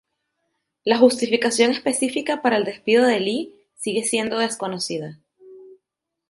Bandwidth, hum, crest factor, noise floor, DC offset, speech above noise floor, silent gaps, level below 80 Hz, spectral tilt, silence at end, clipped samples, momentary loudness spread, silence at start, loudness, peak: 11.5 kHz; none; 20 dB; -83 dBFS; under 0.1%; 62 dB; none; -68 dBFS; -3 dB/octave; 0.55 s; under 0.1%; 12 LU; 0.85 s; -21 LUFS; -2 dBFS